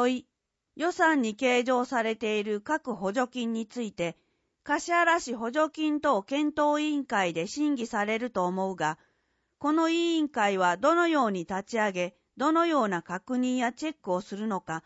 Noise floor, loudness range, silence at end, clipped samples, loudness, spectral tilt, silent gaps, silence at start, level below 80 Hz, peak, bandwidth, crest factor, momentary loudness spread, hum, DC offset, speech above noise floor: -75 dBFS; 3 LU; 0.05 s; under 0.1%; -28 LUFS; -4.5 dB/octave; none; 0 s; -70 dBFS; -12 dBFS; 8 kHz; 16 dB; 9 LU; none; under 0.1%; 47 dB